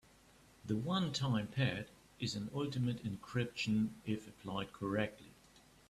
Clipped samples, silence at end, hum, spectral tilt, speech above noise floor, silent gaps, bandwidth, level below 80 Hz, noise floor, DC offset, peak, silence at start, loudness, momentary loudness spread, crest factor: under 0.1%; 0.6 s; none; -6 dB/octave; 27 dB; none; 13.5 kHz; -66 dBFS; -65 dBFS; under 0.1%; -20 dBFS; 0.65 s; -39 LUFS; 8 LU; 18 dB